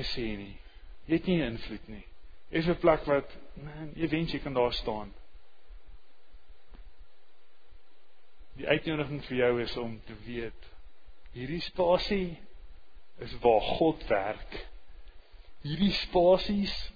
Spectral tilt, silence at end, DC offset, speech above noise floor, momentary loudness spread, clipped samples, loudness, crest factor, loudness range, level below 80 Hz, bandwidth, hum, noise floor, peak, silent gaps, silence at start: -7 dB/octave; 0 s; 0.3%; 37 dB; 19 LU; under 0.1%; -30 LUFS; 22 dB; 7 LU; -46 dBFS; 5 kHz; none; -67 dBFS; -10 dBFS; none; 0 s